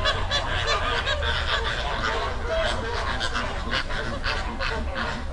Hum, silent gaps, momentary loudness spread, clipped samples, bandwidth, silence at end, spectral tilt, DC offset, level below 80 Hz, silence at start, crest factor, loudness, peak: none; none; 5 LU; under 0.1%; 11.5 kHz; 0 s; -3.5 dB/octave; under 0.1%; -32 dBFS; 0 s; 16 dB; -26 LUFS; -8 dBFS